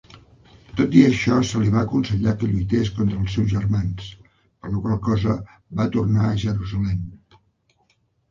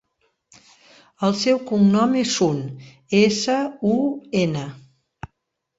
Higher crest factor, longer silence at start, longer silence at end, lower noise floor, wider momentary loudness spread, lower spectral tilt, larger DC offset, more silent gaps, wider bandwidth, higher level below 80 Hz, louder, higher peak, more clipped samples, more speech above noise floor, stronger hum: about the same, 20 dB vs 16 dB; second, 0.15 s vs 1.2 s; first, 1.15 s vs 0.5 s; second, -65 dBFS vs -76 dBFS; second, 12 LU vs 23 LU; first, -7.5 dB/octave vs -5 dB/octave; neither; neither; about the same, 7.4 kHz vs 8 kHz; first, -40 dBFS vs -58 dBFS; about the same, -21 LUFS vs -20 LUFS; first, -2 dBFS vs -6 dBFS; neither; second, 45 dB vs 56 dB; neither